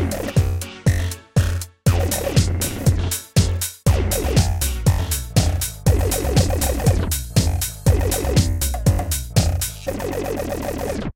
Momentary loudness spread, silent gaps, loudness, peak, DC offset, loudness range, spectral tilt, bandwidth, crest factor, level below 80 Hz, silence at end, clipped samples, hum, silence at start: 6 LU; none; -20 LUFS; -4 dBFS; 0.1%; 1 LU; -5 dB/octave; 17 kHz; 16 dB; -26 dBFS; 0.05 s; under 0.1%; none; 0 s